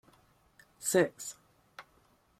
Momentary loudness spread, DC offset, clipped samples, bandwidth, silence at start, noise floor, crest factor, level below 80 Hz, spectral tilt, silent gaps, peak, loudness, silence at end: 25 LU; under 0.1%; under 0.1%; 16 kHz; 0.8 s; -68 dBFS; 22 dB; -76 dBFS; -4 dB/octave; none; -14 dBFS; -32 LUFS; 0.6 s